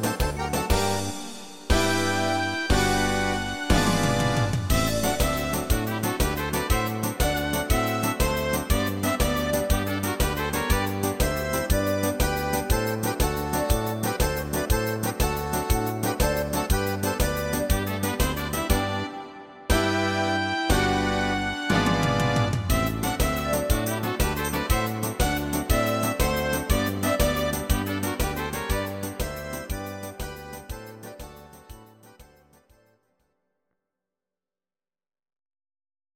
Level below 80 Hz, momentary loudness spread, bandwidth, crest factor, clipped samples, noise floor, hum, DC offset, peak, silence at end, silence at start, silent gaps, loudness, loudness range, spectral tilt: -32 dBFS; 8 LU; 17 kHz; 20 dB; under 0.1%; under -90 dBFS; none; under 0.1%; -6 dBFS; 3.95 s; 0 s; none; -25 LUFS; 6 LU; -4.5 dB/octave